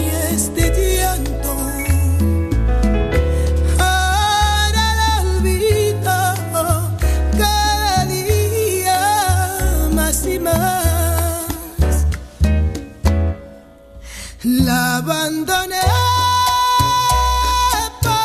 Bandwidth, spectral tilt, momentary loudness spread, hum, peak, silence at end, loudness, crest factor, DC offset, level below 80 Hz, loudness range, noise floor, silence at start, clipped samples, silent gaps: 14 kHz; -4 dB/octave; 6 LU; none; -2 dBFS; 0 s; -17 LUFS; 14 dB; under 0.1%; -22 dBFS; 4 LU; -40 dBFS; 0 s; under 0.1%; none